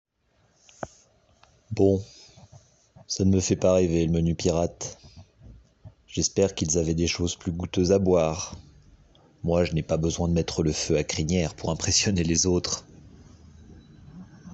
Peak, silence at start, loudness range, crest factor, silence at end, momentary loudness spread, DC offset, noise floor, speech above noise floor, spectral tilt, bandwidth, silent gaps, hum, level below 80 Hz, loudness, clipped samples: -8 dBFS; 0.8 s; 3 LU; 18 dB; 0 s; 15 LU; under 0.1%; -66 dBFS; 42 dB; -5 dB/octave; 8.4 kHz; none; none; -48 dBFS; -25 LUFS; under 0.1%